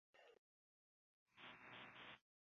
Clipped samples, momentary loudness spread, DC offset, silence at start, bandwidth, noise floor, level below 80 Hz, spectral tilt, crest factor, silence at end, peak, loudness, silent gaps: under 0.1%; 3 LU; under 0.1%; 0.15 s; 6.8 kHz; under -90 dBFS; under -90 dBFS; -0.5 dB/octave; 22 dB; 0.25 s; -44 dBFS; -60 LUFS; 0.38-1.26 s